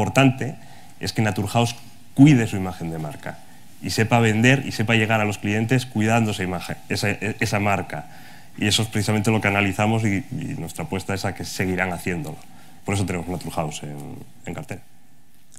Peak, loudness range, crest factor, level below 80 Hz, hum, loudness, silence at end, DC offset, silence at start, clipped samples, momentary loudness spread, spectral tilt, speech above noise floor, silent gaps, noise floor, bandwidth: -2 dBFS; 7 LU; 22 dB; -52 dBFS; none; -22 LUFS; 0.8 s; 1%; 0 s; under 0.1%; 17 LU; -5.5 dB/octave; 34 dB; none; -56 dBFS; 16 kHz